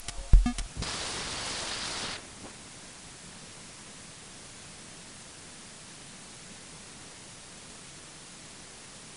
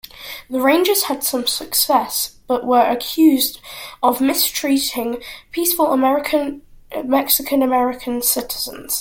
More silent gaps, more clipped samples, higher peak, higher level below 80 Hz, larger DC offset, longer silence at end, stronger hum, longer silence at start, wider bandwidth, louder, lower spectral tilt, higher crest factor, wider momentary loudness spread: neither; neither; second, -6 dBFS vs 0 dBFS; first, -36 dBFS vs -52 dBFS; neither; about the same, 0 s vs 0 s; neither; second, 0 s vs 0.15 s; second, 11 kHz vs 17 kHz; second, -37 LUFS vs -17 LUFS; first, -3 dB/octave vs -1.5 dB/octave; first, 28 dB vs 18 dB; about the same, 13 LU vs 13 LU